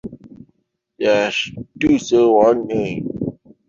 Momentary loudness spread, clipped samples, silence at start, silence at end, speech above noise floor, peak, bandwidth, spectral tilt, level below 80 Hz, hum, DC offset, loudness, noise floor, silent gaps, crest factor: 14 LU; under 0.1%; 0.05 s; 0.35 s; 48 dB; 0 dBFS; 7.6 kHz; -5.5 dB/octave; -50 dBFS; none; under 0.1%; -18 LUFS; -64 dBFS; none; 18 dB